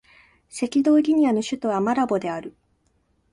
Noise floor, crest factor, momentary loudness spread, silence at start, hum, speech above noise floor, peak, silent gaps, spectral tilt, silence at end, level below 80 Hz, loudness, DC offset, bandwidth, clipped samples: -66 dBFS; 14 dB; 15 LU; 0.55 s; none; 45 dB; -10 dBFS; none; -5.5 dB/octave; 0.8 s; -64 dBFS; -22 LUFS; under 0.1%; 11.5 kHz; under 0.1%